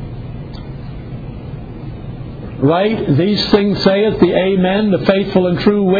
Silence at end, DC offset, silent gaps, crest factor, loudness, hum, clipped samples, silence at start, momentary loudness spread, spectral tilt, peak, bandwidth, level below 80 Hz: 0 s; under 0.1%; none; 16 dB; -13 LUFS; none; under 0.1%; 0 s; 16 LU; -8 dB/octave; 0 dBFS; 5 kHz; -36 dBFS